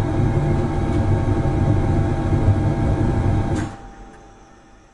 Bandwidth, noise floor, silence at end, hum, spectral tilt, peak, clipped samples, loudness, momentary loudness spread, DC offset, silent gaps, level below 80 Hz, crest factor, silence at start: 10.5 kHz; -47 dBFS; 0.65 s; none; -8.5 dB/octave; -4 dBFS; under 0.1%; -20 LUFS; 6 LU; under 0.1%; none; -28 dBFS; 16 dB; 0 s